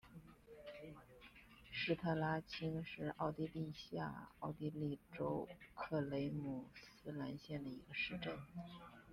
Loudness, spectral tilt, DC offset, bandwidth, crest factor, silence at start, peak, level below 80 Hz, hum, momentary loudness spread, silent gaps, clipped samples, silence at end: -45 LUFS; -7 dB/octave; under 0.1%; 15 kHz; 20 dB; 0.05 s; -26 dBFS; -70 dBFS; none; 17 LU; none; under 0.1%; 0 s